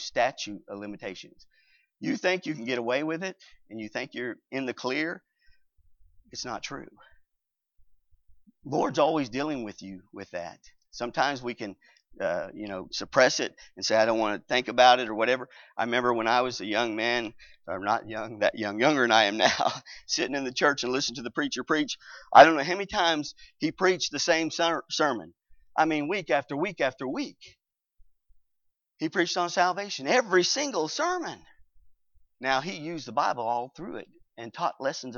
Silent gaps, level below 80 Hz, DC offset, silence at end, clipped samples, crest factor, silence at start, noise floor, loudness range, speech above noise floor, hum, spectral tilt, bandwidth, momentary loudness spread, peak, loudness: none; -66 dBFS; under 0.1%; 0 s; under 0.1%; 26 dB; 0 s; -82 dBFS; 10 LU; 55 dB; none; -3 dB/octave; 7.4 kHz; 16 LU; -4 dBFS; -27 LUFS